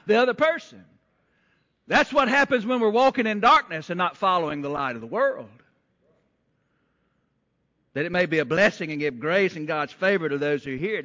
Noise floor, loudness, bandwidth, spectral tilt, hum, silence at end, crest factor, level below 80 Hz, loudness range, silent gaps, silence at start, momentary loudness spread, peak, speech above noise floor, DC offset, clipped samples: -72 dBFS; -23 LUFS; 7.6 kHz; -5.5 dB/octave; none; 0 s; 16 dB; -62 dBFS; 10 LU; none; 0.05 s; 9 LU; -8 dBFS; 49 dB; under 0.1%; under 0.1%